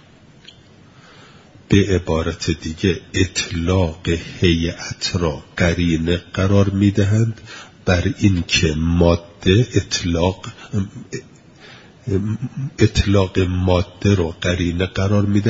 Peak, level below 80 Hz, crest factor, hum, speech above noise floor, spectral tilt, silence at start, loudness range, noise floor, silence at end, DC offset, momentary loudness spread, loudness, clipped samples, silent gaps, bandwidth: 0 dBFS; -38 dBFS; 18 dB; none; 28 dB; -6 dB/octave; 1.7 s; 4 LU; -46 dBFS; 0 s; under 0.1%; 9 LU; -19 LUFS; under 0.1%; none; 7.8 kHz